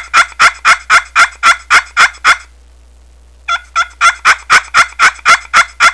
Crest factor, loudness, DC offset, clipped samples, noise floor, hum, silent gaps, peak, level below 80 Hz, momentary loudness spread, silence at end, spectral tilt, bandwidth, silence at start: 10 dB; -8 LUFS; 0.5%; 2%; -41 dBFS; none; none; 0 dBFS; -40 dBFS; 7 LU; 0 s; 1 dB/octave; 11 kHz; 0 s